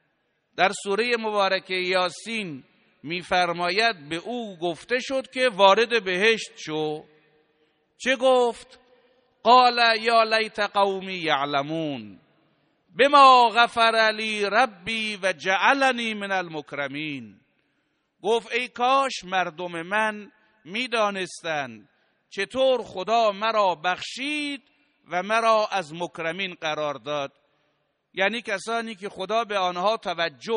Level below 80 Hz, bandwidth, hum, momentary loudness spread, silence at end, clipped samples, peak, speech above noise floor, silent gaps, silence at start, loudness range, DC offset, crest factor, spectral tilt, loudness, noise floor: -68 dBFS; 10 kHz; none; 14 LU; 0 s; under 0.1%; -2 dBFS; 49 dB; none; 0.55 s; 8 LU; under 0.1%; 22 dB; -3 dB/octave; -23 LUFS; -72 dBFS